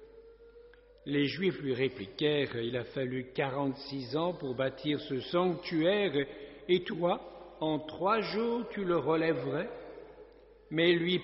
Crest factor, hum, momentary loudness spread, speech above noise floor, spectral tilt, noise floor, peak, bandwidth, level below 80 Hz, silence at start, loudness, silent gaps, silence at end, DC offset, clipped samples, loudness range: 18 dB; none; 9 LU; 25 dB; -4 dB/octave; -56 dBFS; -14 dBFS; 5.8 kHz; -64 dBFS; 0 s; -32 LUFS; none; 0 s; under 0.1%; under 0.1%; 2 LU